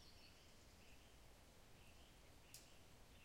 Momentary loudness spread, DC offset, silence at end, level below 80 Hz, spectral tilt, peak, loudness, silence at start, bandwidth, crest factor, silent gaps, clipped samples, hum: 5 LU; under 0.1%; 0 s; -72 dBFS; -3 dB/octave; -40 dBFS; -66 LUFS; 0 s; 16 kHz; 26 dB; none; under 0.1%; none